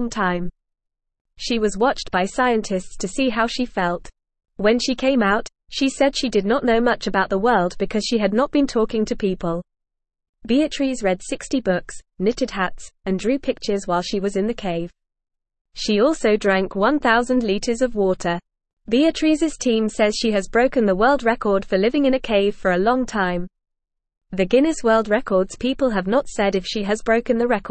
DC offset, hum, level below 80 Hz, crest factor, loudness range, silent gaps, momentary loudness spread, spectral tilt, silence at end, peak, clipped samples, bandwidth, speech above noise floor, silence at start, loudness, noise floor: 0.3%; none; -42 dBFS; 16 dB; 5 LU; 1.21-1.25 s, 10.29-10.33 s, 15.61-15.65 s, 18.73-18.77 s; 8 LU; -5 dB/octave; 0 s; -4 dBFS; under 0.1%; 8.8 kHz; 60 dB; 0 s; -20 LUFS; -80 dBFS